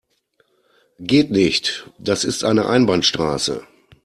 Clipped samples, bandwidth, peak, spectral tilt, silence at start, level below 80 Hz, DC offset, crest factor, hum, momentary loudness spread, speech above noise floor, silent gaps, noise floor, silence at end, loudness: under 0.1%; 14 kHz; -2 dBFS; -4 dB/octave; 1 s; -52 dBFS; under 0.1%; 18 dB; none; 10 LU; 46 dB; none; -64 dBFS; 0.4 s; -18 LUFS